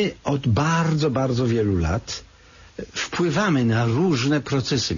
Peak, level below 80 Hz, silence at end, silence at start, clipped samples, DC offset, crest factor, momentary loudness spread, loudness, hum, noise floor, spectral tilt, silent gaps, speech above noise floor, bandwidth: -10 dBFS; -42 dBFS; 0 s; 0 s; under 0.1%; under 0.1%; 12 dB; 11 LU; -22 LUFS; none; -49 dBFS; -5.5 dB/octave; none; 28 dB; 7.4 kHz